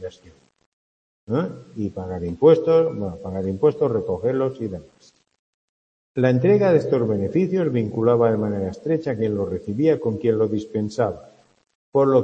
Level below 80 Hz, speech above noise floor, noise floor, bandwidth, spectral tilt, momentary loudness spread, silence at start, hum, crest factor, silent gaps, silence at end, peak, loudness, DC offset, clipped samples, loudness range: -56 dBFS; over 70 dB; under -90 dBFS; 8 kHz; -9 dB/octave; 13 LU; 0 s; none; 18 dB; 0.66-1.27 s, 5.39-6.15 s, 11.75-11.92 s; 0 s; -4 dBFS; -21 LUFS; under 0.1%; under 0.1%; 3 LU